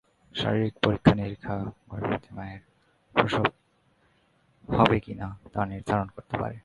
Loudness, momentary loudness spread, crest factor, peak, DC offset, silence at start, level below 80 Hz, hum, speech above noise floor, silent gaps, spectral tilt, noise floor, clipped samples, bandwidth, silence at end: -27 LUFS; 15 LU; 28 dB; 0 dBFS; under 0.1%; 0.35 s; -48 dBFS; none; 39 dB; none; -7.5 dB/octave; -66 dBFS; under 0.1%; 11 kHz; 0.05 s